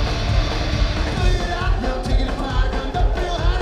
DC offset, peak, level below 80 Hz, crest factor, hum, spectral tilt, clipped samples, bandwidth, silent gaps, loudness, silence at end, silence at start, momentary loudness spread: under 0.1%; -6 dBFS; -20 dBFS; 14 dB; none; -5.5 dB/octave; under 0.1%; 9.8 kHz; none; -22 LUFS; 0 s; 0 s; 2 LU